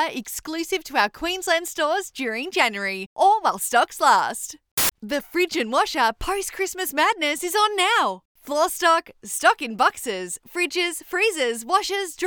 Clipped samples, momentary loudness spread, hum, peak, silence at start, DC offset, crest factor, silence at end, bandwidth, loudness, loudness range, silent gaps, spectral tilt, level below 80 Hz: under 0.1%; 9 LU; none; -4 dBFS; 0 s; under 0.1%; 18 dB; 0 s; over 20 kHz; -22 LUFS; 2 LU; 3.06-3.16 s, 4.71-4.77 s, 8.25-8.35 s; -1.5 dB/octave; -50 dBFS